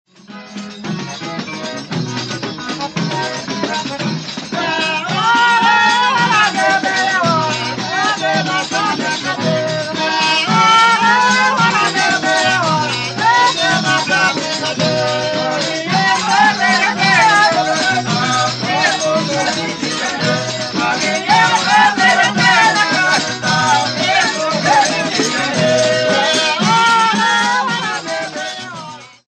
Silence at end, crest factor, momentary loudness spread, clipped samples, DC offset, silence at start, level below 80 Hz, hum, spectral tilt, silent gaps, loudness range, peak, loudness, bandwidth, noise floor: 0.2 s; 14 dB; 11 LU; under 0.1%; under 0.1%; 0.3 s; -56 dBFS; none; -3 dB/octave; none; 5 LU; -2 dBFS; -14 LUFS; 11 kHz; -35 dBFS